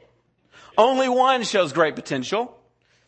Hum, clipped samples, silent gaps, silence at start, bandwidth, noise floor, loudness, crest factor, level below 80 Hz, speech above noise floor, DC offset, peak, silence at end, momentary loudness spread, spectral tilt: none; under 0.1%; none; 0.75 s; 8.8 kHz; -62 dBFS; -21 LUFS; 20 dB; -68 dBFS; 42 dB; under 0.1%; -2 dBFS; 0.6 s; 9 LU; -4 dB/octave